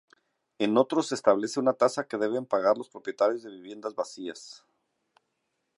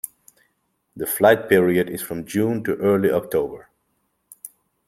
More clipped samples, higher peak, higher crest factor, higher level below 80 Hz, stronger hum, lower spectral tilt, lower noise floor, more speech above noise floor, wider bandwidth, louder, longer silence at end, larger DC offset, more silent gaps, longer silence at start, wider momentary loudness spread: neither; second, -8 dBFS vs -2 dBFS; about the same, 22 dB vs 20 dB; second, -80 dBFS vs -58 dBFS; neither; about the same, -4.5 dB/octave vs -5.5 dB/octave; first, -79 dBFS vs -71 dBFS; about the same, 52 dB vs 51 dB; second, 11.5 kHz vs 16 kHz; second, -27 LUFS vs -20 LUFS; first, 1.2 s vs 0.4 s; neither; neither; first, 0.6 s vs 0.05 s; second, 14 LU vs 23 LU